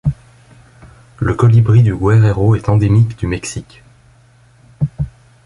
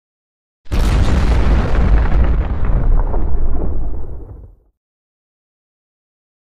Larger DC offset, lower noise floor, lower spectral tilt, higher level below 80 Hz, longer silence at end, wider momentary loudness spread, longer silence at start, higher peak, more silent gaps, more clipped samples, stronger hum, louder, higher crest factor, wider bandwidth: neither; first, -48 dBFS vs -37 dBFS; about the same, -8 dB/octave vs -7.5 dB/octave; second, -34 dBFS vs -16 dBFS; second, 0.35 s vs 1.75 s; about the same, 15 LU vs 13 LU; second, 0.05 s vs 0.65 s; about the same, 0 dBFS vs -2 dBFS; neither; neither; neither; first, -14 LUFS vs -18 LUFS; about the same, 14 dB vs 12 dB; first, 11 kHz vs 9.2 kHz